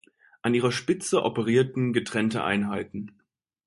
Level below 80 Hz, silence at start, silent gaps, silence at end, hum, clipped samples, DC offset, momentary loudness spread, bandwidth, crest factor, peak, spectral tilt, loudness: -62 dBFS; 0.45 s; none; 0.6 s; none; under 0.1%; under 0.1%; 10 LU; 11.5 kHz; 18 dB; -8 dBFS; -5.5 dB/octave; -26 LUFS